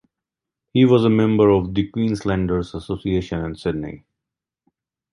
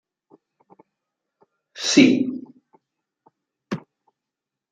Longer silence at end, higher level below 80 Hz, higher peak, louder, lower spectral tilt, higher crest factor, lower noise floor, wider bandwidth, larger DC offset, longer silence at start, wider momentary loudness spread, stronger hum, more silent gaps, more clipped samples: first, 1.15 s vs 0.95 s; first, -42 dBFS vs -72 dBFS; about the same, -2 dBFS vs -2 dBFS; about the same, -20 LUFS vs -20 LUFS; first, -8 dB/octave vs -3.5 dB/octave; second, 18 dB vs 24 dB; about the same, -85 dBFS vs -86 dBFS; first, 11 kHz vs 9.4 kHz; neither; second, 0.75 s vs 1.75 s; second, 12 LU vs 21 LU; neither; neither; neither